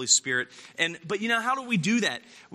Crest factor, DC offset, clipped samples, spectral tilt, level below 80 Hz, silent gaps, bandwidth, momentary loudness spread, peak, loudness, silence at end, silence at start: 20 dB; under 0.1%; under 0.1%; -2 dB/octave; -76 dBFS; none; 13.5 kHz; 9 LU; -6 dBFS; -26 LUFS; 0 s; 0 s